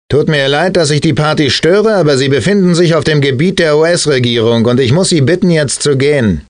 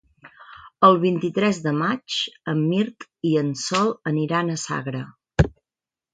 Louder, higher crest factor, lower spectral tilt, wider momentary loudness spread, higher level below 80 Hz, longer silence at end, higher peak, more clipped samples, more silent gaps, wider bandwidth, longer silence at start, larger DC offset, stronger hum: first, -10 LUFS vs -22 LUFS; second, 8 dB vs 20 dB; about the same, -5 dB/octave vs -5.5 dB/octave; second, 2 LU vs 11 LU; about the same, -38 dBFS vs -40 dBFS; second, 0.1 s vs 0.65 s; first, 0 dBFS vs -4 dBFS; neither; neither; about the same, 10 kHz vs 9.4 kHz; second, 0.1 s vs 0.25 s; neither; neither